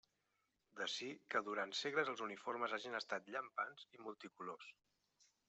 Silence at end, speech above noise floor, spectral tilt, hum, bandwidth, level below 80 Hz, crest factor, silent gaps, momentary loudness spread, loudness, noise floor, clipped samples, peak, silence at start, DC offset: 0.75 s; 40 dB; -2.5 dB/octave; none; 8.2 kHz; under -90 dBFS; 22 dB; none; 14 LU; -44 LUFS; -86 dBFS; under 0.1%; -24 dBFS; 0.75 s; under 0.1%